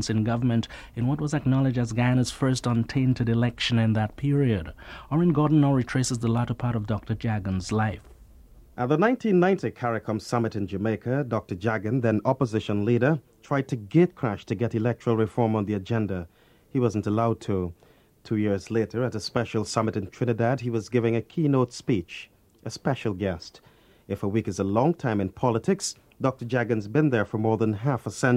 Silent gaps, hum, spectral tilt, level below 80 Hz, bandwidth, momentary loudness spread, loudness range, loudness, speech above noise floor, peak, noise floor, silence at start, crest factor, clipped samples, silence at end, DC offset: none; none; -6.5 dB/octave; -52 dBFS; 12 kHz; 7 LU; 4 LU; -26 LUFS; 26 dB; -6 dBFS; -51 dBFS; 0 s; 18 dB; under 0.1%; 0 s; under 0.1%